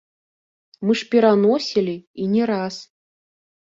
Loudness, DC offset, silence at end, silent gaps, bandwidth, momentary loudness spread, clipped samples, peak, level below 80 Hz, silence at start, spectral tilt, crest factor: -20 LUFS; under 0.1%; 0.75 s; 2.07-2.14 s; 7.6 kHz; 12 LU; under 0.1%; -4 dBFS; -66 dBFS; 0.8 s; -6 dB/octave; 18 dB